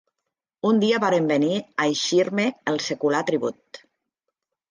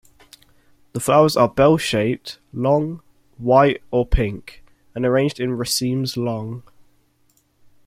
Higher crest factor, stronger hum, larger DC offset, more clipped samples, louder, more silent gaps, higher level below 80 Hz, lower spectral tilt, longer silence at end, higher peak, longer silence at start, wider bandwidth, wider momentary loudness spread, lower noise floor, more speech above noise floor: about the same, 16 dB vs 18 dB; neither; neither; neither; second, -22 LUFS vs -19 LUFS; neither; second, -74 dBFS vs -34 dBFS; about the same, -4.5 dB/octave vs -5.5 dB/octave; second, 0.95 s vs 1.25 s; second, -8 dBFS vs -2 dBFS; second, 0.65 s vs 0.95 s; second, 10 kHz vs 16.5 kHz; second, 6 LU vs 18 LU; first, -83 dBFS vs -62 dBFS; first, 61 dB vs 43 dB